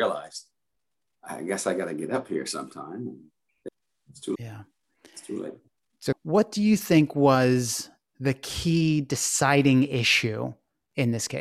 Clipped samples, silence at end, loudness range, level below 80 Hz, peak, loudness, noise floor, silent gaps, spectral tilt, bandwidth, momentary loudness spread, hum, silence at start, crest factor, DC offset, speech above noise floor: under 0.1%; 0 s; 14 LU; -56 dBFS; -6 dBFS; -25 LUFS; -85 dBFS; none; -4.5 dB/octave; 15.5 kHz; 20 LU; none; 0 s; 20 dB; under 0.1%; 60 dB